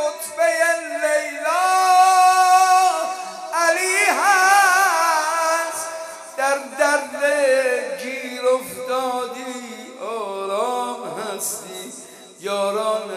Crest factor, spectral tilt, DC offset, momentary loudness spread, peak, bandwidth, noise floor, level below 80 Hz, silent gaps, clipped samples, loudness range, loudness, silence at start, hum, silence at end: 16 dB; -0.5 dB/octave; under 0.1%; 16 LU; -2 dBFS; 15.5 kHz; -40 dBFS; -80 dBFS; none; under 0.1%; 10 LU; -18 LUFS; 0 s; none; 0 s